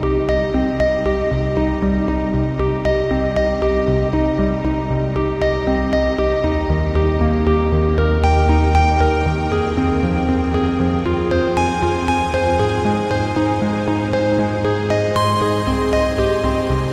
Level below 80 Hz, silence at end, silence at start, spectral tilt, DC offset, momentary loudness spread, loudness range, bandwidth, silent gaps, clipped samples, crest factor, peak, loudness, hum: -26 dBFS; 0 s; 0 s; -7 dB/octave; under 0.1%; 3 LU; 2 LU; 11 kHz; none; under 0.1%; 14 dB; -4 dBFS; -18 LUFS; none